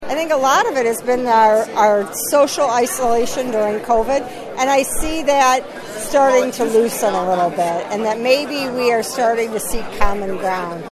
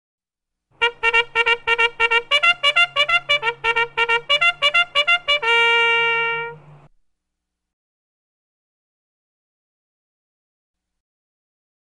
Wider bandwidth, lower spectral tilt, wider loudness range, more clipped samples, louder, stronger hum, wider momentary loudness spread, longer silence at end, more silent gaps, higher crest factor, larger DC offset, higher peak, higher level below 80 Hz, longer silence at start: first, 14 kHz vs 11 kHz; first, -3 dB/octave vs 0 dB/octave; second, 3 LU vs 6 LU; neither; about the same, -17 LUFS vs -16 LUFS; neither; first, 8 LU vs 5 LU; second, 0 s vs 5.4 s; neither; about the same, 16 dB vs 18 dB; neither; first, 0 dBFS vs -4 dBFS; first, -36 dBFS vs -54 dBFS; second, 0 s vs 0.8 s